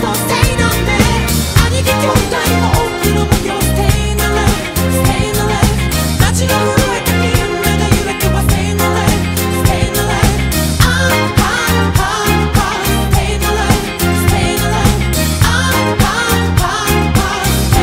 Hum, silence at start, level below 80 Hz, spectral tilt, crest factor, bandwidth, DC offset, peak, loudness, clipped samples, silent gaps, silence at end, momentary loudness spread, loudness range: none; 0 s; -20 dBFS; -4.5 dB/octave; 12 dB; 16.5 kHz; under 0.1%; 0 dBFS; -13 LUFS; under 0.1%; none; 0 s; 2 LU; 1 LU